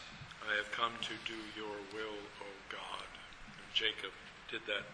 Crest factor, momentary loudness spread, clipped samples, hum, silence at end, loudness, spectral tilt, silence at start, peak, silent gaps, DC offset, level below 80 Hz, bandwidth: 22 dB; 15 LU; under 0.1%; none; 0 s; -40 LUFS; -2.5 dB/octave; 0 s; -20 dBFS; none; under 0.1%; -66 dBFS; 11 kHz